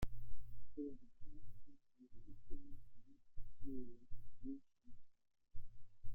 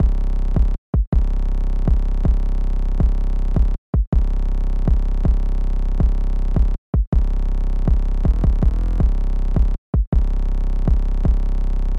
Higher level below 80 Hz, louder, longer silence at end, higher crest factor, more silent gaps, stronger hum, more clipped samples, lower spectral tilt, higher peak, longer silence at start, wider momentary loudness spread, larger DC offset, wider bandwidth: second, -56 dBFS vs -16 dBFS; second, -57 LUFS vs -22 LUFS; about the same, 0 s vs 0 s; about the same, 14 dB vs 10 dB; second, none vs 0.78-0.93 s, 1.07-1.12 s, 3.78-3.93 s, 4.07-4.12 s, 6.78-6.93 s, 7.07-7.12 s, 9.78-9.93 s, 10.07-10.12 s; neither; neither; second, -8 dB/octave vs -9.5 dB/octave; second, -28 dBFS vs -6 dBFS; about the same, 0 s vs 0 s; first, 16 LU vs 4 LU; neither; first, 3.6 kHz vs 2.7 kHz